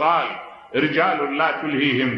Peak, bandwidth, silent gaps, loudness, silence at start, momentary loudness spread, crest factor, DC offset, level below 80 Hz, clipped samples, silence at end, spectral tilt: -6 dBFS; 6.2 kHz; none; -21 LUFS; 0 s; 8 LU; 16 dB; under 0.1%; -66 dBFS; under 0.1%; 0 s; -7.5 dB/octave